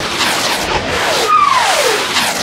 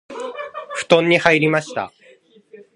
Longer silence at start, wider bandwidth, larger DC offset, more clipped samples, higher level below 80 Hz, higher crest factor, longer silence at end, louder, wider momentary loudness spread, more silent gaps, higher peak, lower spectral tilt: about the same, 0 s vs 0.1 s; first, 16 kHz vs 11.5 kHz; neither; neither; first, -40 dBFS vs -62 dBFS; second, 14 dB vs 20 dB; second, 0 s vs 0.15 s; first, -12 LUFS vs -17 LUFS; second, 5 LU vs 17 LU; neither; about the same, 0 dBFS vs 0 dBFS; second, -1.5 dB/octave vs -5 dB/octave